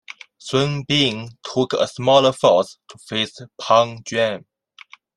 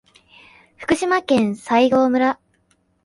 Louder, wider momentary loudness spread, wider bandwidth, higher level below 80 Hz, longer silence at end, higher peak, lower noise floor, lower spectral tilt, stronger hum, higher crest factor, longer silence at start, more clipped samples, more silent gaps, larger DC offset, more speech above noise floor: about the same, -19 LUFS vs -18 LUFS; first, 15 LU vs 8 LU; about the same, 11.5 kHz vs 11.5 kHz; about the same, -60 dBFS vs -56 dBFS; about the same, 0.75 s vs 0.7 s; about the same, -2 dBFS vs -2 dBFS; second, -47 dBFS vs -63 dBFS; about the same, -4.5 dB/octave vs -5 dB/octave; neither; about the same, 20 dB vs 18 dB; second, 0.45 s vs 0.8 s; neither; neither; neither; second, 28 dB vs 46 dB